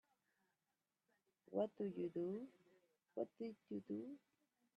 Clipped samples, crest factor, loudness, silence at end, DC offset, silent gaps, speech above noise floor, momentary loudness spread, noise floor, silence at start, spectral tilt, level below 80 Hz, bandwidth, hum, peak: under 0.1%; 20 dB; -48 LUFS; 0.6 s; under 0.1%; none; over 43 dB; 11 LU; under -90 dBFS; 1.5 s; -9 dB/octave; under -90 dBFS; 7.6 kHz; none; -30 dBFS